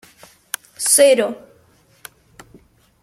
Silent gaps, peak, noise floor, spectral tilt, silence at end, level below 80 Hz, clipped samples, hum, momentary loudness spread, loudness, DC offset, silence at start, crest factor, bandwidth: none; 0 dBFS; -54 dBFS; -1 dB/octave; 1.65 s; -64 dBFS; under 0.1%; none; 19 LU; -14 LUFS; under 0.1%; 0.8 s; 20 dB; 16.5 kHz